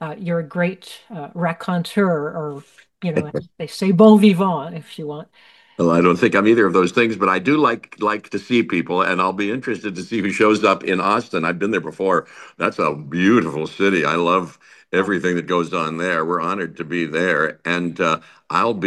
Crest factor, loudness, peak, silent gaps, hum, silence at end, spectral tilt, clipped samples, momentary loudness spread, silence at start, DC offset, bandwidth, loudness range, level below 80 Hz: 18 dB; -19 LUFS; 0 dBFS; none; none; 0 s; -6.5 dB/octave; under 0.1%; 14 LU; 0 s; under 0.1%; 12.5 kHz; 4 LU; -62 dBFS